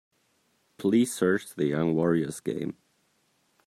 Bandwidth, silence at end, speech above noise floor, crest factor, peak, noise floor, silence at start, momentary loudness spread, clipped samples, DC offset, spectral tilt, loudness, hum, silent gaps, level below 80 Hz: 15 kHz; 0.95 s; 44 dB; 18 dB; -12 dBFS; -70 dBFS; 0.8 s; 10 LU; under 0.1%; under 0.1%; -6 dB/octave; -27 LUFS; none; none; -66 dBFS